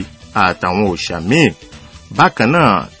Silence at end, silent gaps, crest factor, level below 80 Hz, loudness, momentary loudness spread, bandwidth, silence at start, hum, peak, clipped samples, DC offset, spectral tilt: 0.1 s; none; 14 dB; -40 dBFS; -14 LUFS; 8 LU; 8 kHz; 0 s; none; 0 dBFS; 0.1%; under 0.1%; -5.5 dB/octave